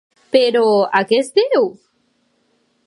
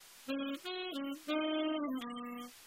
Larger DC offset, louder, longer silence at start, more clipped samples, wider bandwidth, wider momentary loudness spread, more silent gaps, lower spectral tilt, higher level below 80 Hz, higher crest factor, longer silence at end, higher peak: neither; first, -15 LUFS vs -39 LUFS; first, 0.35 s vs 0 s; neither; second, 11.5 kHz vs 16 kHz; second, 4 LU vs 8 LU; neither; first, -4.5 dB/octave vs -3 dB/octave; first, -72 dBFS vs -84 dBFS; about the same, 16 dB vs 16 dB; first, 1.15 s vs 0 s; first, 0 dBFS vs -24 dBFS